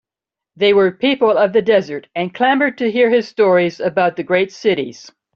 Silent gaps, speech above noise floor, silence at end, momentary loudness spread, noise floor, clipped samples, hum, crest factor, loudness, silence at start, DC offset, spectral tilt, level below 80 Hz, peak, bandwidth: none; 71 dB; 0.35 s; 7 LU; -86 dBFS; under 0.1%; none; 14 dB; -15 LUFS; 0.6 s; under 0.1%; -6 dB/octave; -62 dBFS; -2 dBFS; 7 kHz